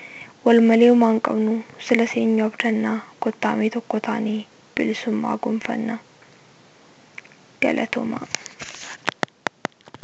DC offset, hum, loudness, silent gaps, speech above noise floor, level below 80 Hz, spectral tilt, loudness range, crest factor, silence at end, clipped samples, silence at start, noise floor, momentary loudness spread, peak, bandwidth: under 0.1%; none; -21 LUFS; none; 31 dB; -66 dBFS; -5 dB/octave; 9 LU; 22 dB; 0.95 s; under 0.1%; 0 s; -51 dBFS; 18 LU; 0 dBFS; 8 kHz